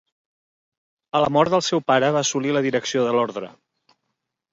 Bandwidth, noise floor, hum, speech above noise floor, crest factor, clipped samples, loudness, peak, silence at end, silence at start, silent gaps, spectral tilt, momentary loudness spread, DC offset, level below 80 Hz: 7.8 kHz; -78 dBFS; none; 58 dB; 20 dB; under 0.1%; -20 LUFS; -4 dBFS; 1.05 s; 1.15 s; none; -4 dB/octave; 8 LU; under 0.1%; -64 dBFS